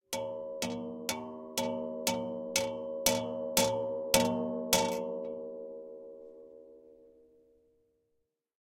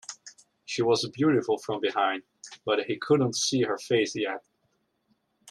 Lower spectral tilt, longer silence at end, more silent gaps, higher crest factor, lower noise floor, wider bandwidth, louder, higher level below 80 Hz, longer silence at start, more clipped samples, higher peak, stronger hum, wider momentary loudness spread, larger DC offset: second, -2.5 dB/octave vs -4 dB/octave; first, 1.55 s vs 0 s; neither; first, 30 dB vs 18 dB; first, -81 dBFS vs -73 dBFS; first, 16.5 kHz vs 13 kHz; second, -33 LUFS vs -27 LUFS; first, -62 dBFS vs -72 dBFS; about the same, 0.1 s vs 0.1 s; neither; first, -4 dBFS vs -10 dBFS; neither; first, 19 LU vs 13 LU; neither